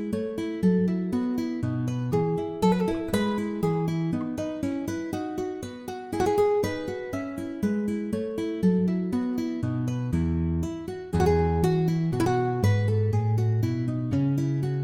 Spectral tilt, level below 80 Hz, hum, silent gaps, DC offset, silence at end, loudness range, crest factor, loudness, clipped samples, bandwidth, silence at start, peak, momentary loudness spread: -8 dB/octave; -48 dBFS; none; none; under 0.1%; 0 s; 4 LU; 16 dB; -27 LUFS; under 0.1%; 16.5 kHz; 0 s; -10 dBFS; 8 LU